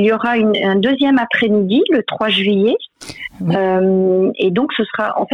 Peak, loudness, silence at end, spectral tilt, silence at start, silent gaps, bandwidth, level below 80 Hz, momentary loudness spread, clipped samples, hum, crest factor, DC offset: -4 dBFS; -15 LUFS; 0 s; -6.5 dB/octave; 0 s; none; 11 kHz; -58 dBFS; 6 LU; under 0.1%; none; 12 dB; under 0.1%